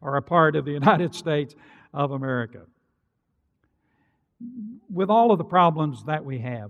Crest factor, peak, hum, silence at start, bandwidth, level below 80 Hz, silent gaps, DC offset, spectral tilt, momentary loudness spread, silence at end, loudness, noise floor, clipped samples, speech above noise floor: 20 dB; -4 dBFS; none; 0 s; 11.5 kHz; -68 dBFS; none; under 0.1%; -7.5 dB/octave; 19 LU; 0 s; -22 LUFS; -74 dBFS; under 0.1%; 51 dB